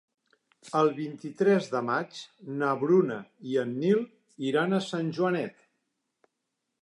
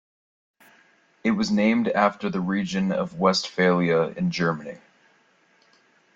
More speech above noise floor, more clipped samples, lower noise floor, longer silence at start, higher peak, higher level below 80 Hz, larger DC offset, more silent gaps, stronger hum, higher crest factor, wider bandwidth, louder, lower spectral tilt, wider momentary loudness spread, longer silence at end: first, 55 dB vs 39 dB; neither; first, -83 dBFS vs -62 dBFS; second, 0.65 s vs 1.25 s; second, -12 dBFS vs -6 dBFS; second, -82 dBFS vs -62 dBFS; neither; neither; neither; about the same, 18 dB vs 18 dB; first, 11 kHz vs 7.8 kHz; second, -28 LUFS vs -23 LUFS; about the same, -6.5 dB/octave vs -6 dB/octave; first, 14 LU vs 6 LU; about the same, 1.3 s vs 1.4 s